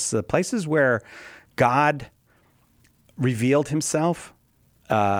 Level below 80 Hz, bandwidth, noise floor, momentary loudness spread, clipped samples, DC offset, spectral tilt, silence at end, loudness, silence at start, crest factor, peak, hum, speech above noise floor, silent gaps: -58 dBFS; 19 kHz; -61 dBFS; 13 LU; under 0.1%; under 0.1%; -5 dB/octave; 0 s; -23 LUFS; 0 s; 18 dB; -6 dBFS; none; 39 dB; none